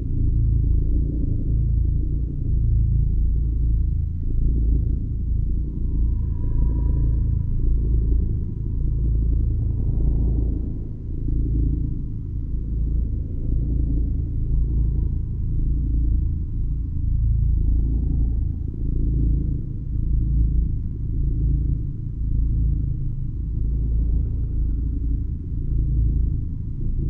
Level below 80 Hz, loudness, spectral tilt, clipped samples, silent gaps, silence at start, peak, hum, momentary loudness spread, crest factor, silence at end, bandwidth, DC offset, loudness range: -22 dBFS; -25 LUFS; -13.5 dB/octave; under 0.1%; none; 0 s; -8 dBFS; none; 6 LU; 12 dB; 0 s; 1 kHz; under 0.1%; 2 LU